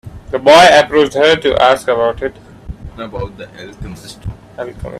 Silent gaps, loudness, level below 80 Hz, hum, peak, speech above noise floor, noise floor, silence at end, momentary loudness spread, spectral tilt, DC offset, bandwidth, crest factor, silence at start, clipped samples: none; -10 LUFS; -36 dBFS; none; 0 dBFS; 17 dB; -30 dBFS; 0 s; 24 LU; -4 dB/octave; under 0.1%; 14 kHz; 14 dB; 0.05 s; 0.1%